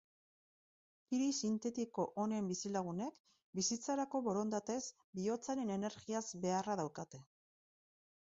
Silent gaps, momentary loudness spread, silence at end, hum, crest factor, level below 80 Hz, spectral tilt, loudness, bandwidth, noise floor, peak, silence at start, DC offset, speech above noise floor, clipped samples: 3.20-3.24 s, 3.44-3.53 s, 5.04-5.13 s; 8 LU; 1.15 s; none; 16 dB; -80 dBFS; -5.5 dB/octave; -40 LUFS; 7.6 kHz; under -90 dBFS; -24 dBFS; 1.1 s; under 0.1%; over 50 dB; under 0.1%